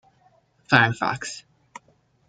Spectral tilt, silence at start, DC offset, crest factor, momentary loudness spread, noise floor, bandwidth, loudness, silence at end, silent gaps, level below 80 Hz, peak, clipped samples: -4.5 dB/octave; 0.7 s; under 0.1%; 26 dB; 17 LU; -62 dBFS; 9.4 kHz; -21 LUFS; 0.9 s; none; -60 dBFS; 0 dBFS; under 0.1%